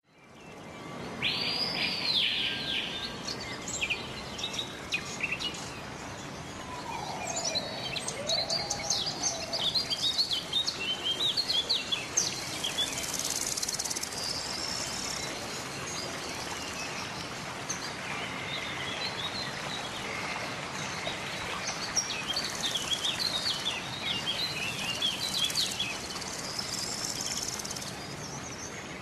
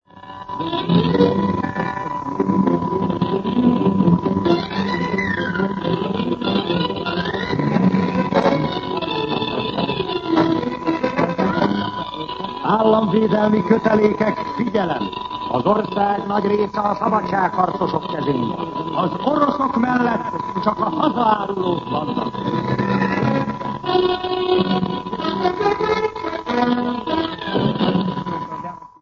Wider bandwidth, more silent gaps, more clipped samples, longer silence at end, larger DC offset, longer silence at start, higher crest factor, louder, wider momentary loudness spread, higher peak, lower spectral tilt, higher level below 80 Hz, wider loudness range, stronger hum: first, 13 kHz vs 7 kHz; neither; neither; second, 0 s vs 0.15 s; neither; about the same, 0.15 s vs 0.15 s; about the same, 20 dB vs 18 dB; second, -31 LUFS vs -20 LUFS; first, 11 LU vs 7 LU; second, -14 dBFS vs 0 dBFS; second, -1 dB/octave vs -7.5 dB/octave; second, -58 dBFS vs -48 dBFS; first, 6 LU vs 2 LU; neither